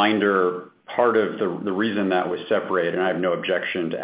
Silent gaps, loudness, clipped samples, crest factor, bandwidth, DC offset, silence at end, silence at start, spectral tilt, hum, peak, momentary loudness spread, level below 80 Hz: none; -22 LUFS; under 0.1%; 16 dB; 4 kHz; under 0.1%; 0 s; 0 s; -9.5 dB/octave; none; -6 dBFS; 6 LU; -66 dBFS